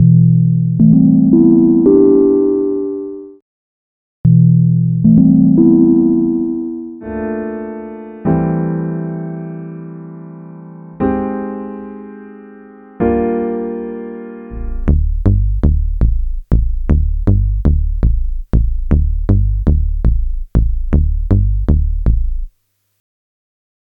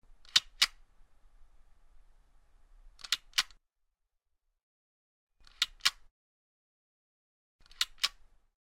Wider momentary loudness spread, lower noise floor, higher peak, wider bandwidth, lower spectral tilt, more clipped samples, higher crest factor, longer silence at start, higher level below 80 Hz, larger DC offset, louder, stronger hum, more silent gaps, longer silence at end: first, 19 LU vs 6 LU; second, -63 dBFS vs -81 dBFS; first, 0 dBFS vs -6 dBFS; second, 2.6 kHz vs 16 kHz; first, -13 dB/octave vs 3 dB/octave; neither; second, 14 dB vs 34 dB; second, 0 s vs 0.35 s; first, -18 dBFS vs -62 dBFS; neither; first, -14 LUFS vs -31 LUFS; neither; second, 3.42-4.24 s vs 4.63-5.27 s, 6.11-7.59 s; first, 1.5 s vs 0.55 s